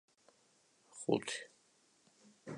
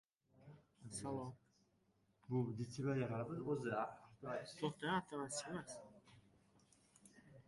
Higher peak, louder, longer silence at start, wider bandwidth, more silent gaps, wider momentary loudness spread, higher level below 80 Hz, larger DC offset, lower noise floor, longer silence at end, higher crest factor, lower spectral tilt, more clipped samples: first, -18 dBFS vs -28 dBFS; first, -39 LUFS vs -45 LUFS; first, 0.9 s vs 0.4 s; about the same, 11 kHz vs 11.5 kHz; neither; about the same, 21 LU vs 22 LU; second, -84 dBFS vs -76 dBFS; neither; second, -72 dBFS vs -79 dBFS; about the same, 0 s vs 0.05 s; first, 26 dB vs 20 dB; second, -4 dB/octave vs -5.5 dB/octave; neither